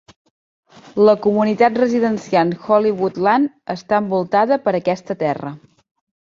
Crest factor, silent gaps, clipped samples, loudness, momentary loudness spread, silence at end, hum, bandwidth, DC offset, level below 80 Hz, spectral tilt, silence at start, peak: 16 dB; none; under 0.1%; -17 LUFS; 8 LU; 0.65 s; none; 7.4 kHz; under 0.1%; -62 dBFS; -7 dB/octave; 0.95 s; -2 dBFS